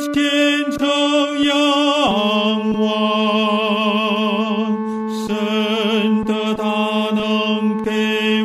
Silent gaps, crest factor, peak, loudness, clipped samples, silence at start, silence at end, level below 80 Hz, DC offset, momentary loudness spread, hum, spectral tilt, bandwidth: none; 14 dB; -4 dBFS; -17 LUFS; under 0.1%; 0 s; 0 s; -54 dBFS; under 0.1%; 5 LU; none; -4.5 dB/octave; 14 kHz